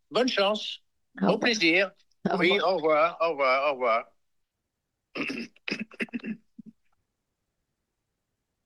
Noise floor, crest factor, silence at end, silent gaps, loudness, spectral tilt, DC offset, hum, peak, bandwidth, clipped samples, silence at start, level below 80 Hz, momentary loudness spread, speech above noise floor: -83 dBFS; 20 dB; 1.95 s; none; -26 LUFS; -4.5 dB/octave; under 0.1%; none; -10 dBFS; 12 kHz; under 0.1%; 0.1 s; -76 dBFS; 13 LU; 57 dB